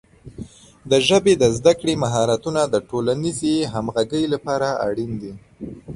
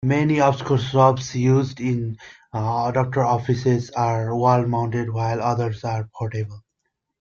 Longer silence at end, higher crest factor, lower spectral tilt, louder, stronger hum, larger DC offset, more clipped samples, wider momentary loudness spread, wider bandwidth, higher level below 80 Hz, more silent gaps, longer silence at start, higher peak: second, 0 s vs 0.6 s; about the same, 18 dB vs 18 dB; second, -5 dB/octave vs -7 dB/octave; about the same, -20 LUFS vs -21 LUFS; neither; neither; neither; first, 21 LU vs 10 LU; first, 11.5 kHz vs 7.2 kHz; about the same, -48 dBFS vs -52 dBFS; neither; first, 0.25 s vs 0 s; about the same, -2 dBFS vs -4 dBFS